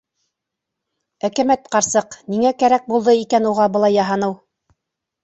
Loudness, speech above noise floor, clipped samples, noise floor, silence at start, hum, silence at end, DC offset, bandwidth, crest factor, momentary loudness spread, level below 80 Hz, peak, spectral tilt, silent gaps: -17 LUFS; 65 dB; under 0.1%; -81 dBFS; 1.25 s; none; 0.9 s; under 0.1%; 8.2 kHz; 16 dB; 9 LU; -60 dBFS; -2 dBFS; -4 dB/octave; none